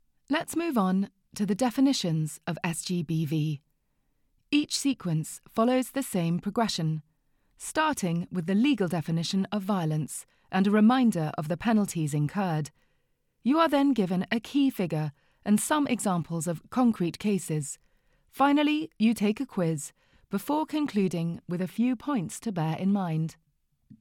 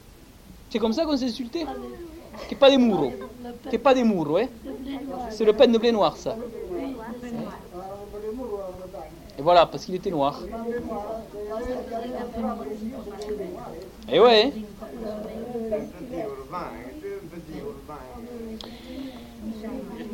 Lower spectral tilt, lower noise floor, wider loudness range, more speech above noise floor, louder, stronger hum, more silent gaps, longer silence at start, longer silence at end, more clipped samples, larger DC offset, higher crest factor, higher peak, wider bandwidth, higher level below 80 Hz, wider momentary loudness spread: about the same, -5.5 dB/octave vs -5.5 dB/octave; first, -72 dBFS vs -48 dBFS; second, 3 LU vs 12 LU; first, 46 dB vs 26 dB; second, -28 LUFS vs -25 LUFS; neither; neither; first, 0.3 s vs 0.05 s; about the same, 0.05 s vs 0 s; neither; neither; second, 16 dB vs 22 dB; second, -10 dBFS vs -4 dBFS; about the same, 17.5 kHz vs 17 kHz; second, -64 dBFS vs -50 dBFS; second, 9 LU vs 20 LU